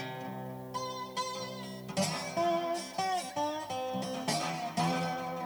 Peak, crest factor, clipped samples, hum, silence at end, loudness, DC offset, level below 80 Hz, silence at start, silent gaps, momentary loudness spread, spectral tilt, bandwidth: -18 dBFS; 18 dB; under 0.1%; none; 0 s; -35 LUFS; under 0.1%; -72 dBFS; 0 s; none; 9 LU; -4 dB/octave; over 20 kHz